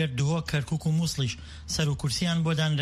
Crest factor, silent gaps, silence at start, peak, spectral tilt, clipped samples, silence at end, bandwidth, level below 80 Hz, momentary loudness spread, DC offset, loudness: 14 dB; none; 0 s; -14 dBFS; -5 dB/octave; under 0.1%; 0 s; 14.5 kHz; -46 dBFS; 6 LU; under 0.1%; -27 LUFS